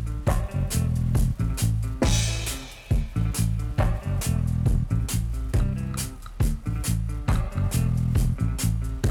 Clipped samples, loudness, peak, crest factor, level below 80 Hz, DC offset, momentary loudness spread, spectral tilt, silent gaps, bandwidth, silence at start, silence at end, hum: under 0.1%; -26 LUFS; -10 dBFS; 14 dB; -28 dBFS; under 0.1%; 5 LU; -5.5 dB/octave; none; 19.5 kHz; 0 s; 0 s; none